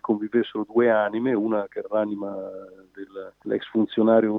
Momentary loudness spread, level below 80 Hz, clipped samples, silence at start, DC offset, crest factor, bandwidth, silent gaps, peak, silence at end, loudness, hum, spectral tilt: 18 LU; -72 dBFS; under 0.1%; 0.05 s; under 0.1%; 18 dB; 4.1 kHz; none; -6 dBFS; 0 s; -24 LUFS; none; -9 dB/octave